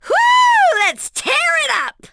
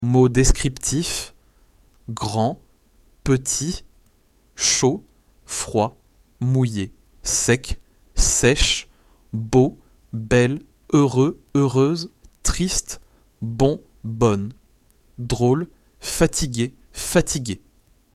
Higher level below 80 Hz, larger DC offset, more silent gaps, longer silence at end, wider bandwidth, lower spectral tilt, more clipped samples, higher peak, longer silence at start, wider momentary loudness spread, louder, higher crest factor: second, -58 dBFS vs -32 dBFS; neither; neither; second, 0.2 s vs 0.6 s; second, 11 kHz vs 15 kHz; second, 1 dB/octave vs -4.5 dB/octave; neither; about the same, -2 dBFS vs -2 dBFS; about the same, 0.05 s vs 0 s; second, 8 LU vs 17 LU; first, -13 LUFS vs -21 LUFS; second, 12 dB vs 20 dB